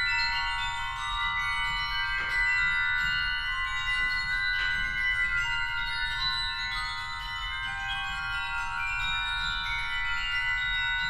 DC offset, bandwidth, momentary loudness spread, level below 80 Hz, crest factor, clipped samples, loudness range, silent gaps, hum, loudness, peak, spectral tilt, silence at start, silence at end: under 0.1%; 15 kHz; 6 LU; -42 dBFS; 14 dB; under 0.1%; 4 LU; none; none; -28 LUFS; -16 dBFS; -1 dB/octave; 0 s; 0 s